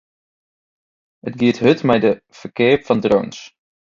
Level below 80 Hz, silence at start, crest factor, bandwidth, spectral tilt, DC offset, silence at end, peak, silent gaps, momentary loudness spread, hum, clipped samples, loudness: -54 dBFS; 1.25 s; 18 dB; 7.4 kHz; -6.5 dB/octave; under 0.1%; 0.5 s; 0 dBFS; none; 17 LU; none; under 0.1%; -17 LUFS